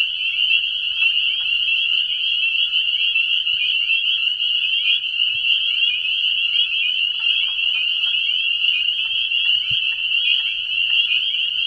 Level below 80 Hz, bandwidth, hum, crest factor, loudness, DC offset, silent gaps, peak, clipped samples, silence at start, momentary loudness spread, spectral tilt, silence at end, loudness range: -60 dBFS; 10.5 kHz; none; 14 dB; -16 LUFS; under 0.1%; none; -4 dBFS; under 0.1%; 0 s; 2 LU; 1 dB/octave; 0 s; 0 LU